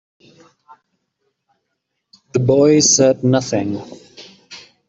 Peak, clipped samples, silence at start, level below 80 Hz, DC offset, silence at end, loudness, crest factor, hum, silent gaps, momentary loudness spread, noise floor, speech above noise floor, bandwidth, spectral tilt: -2 dBFS; under 0.1%; 2.35 s; -58 dBFS; under 0.1%; 0.3 s; -14 LUFS; 16 dB; none; none; 27 LU; -74 dBFS; 60 dB; 8.2 kHz; -4.5 dB/octave